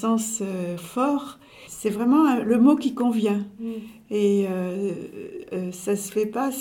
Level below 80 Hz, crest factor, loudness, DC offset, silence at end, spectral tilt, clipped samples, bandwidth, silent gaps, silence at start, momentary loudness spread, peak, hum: -64 dBFS; 16 dB; -24 LUFS; under 0.1%; 0 s; -5.5 dB/octave; under 0.1%; 17.5 kHz; none; 0 s; 15 LU; -6 dBFS; none